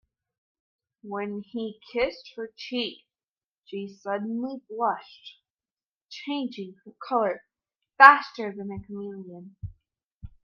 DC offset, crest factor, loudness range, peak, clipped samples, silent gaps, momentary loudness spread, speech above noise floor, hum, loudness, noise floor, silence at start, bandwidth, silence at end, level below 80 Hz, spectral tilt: under 0.1%; 28 dB; 11 LU; 0 dBFS; under 0.1%; 3.28-3.50 s, 3.58-3.62 s, 5.50-5.55 s, 5.71-5.77 s, 5.83-6.01 s, 10.04-10.20 s; 21 LU; over 64 dB; none; -24 LUFS; under -90 dBFS; 1.05 s; 7 kHz; 0.15 s; -60 dBFS; -5.5 dB/octave